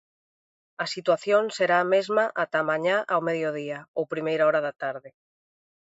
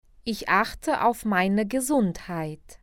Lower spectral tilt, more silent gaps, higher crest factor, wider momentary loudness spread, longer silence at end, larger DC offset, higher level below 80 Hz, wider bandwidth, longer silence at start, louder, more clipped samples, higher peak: about the same, -5 dB/octave vs -5 dB/octave; first, 3.88-3.94 s vs none; about the same, 18 dB vs 18 dB; about the same, 11 LU vs 10 LU; first, 0.85 s vs 0.1 s; neither; second, -78 dBFS vs -50 dBFS; second, 8 kHz vs 17 kHz; first, 0.8 s vs 0.25 s; about the same, -25 LUFS vs -25 LUFS; neither; about the same, -8 dBFS vs -6 dBFS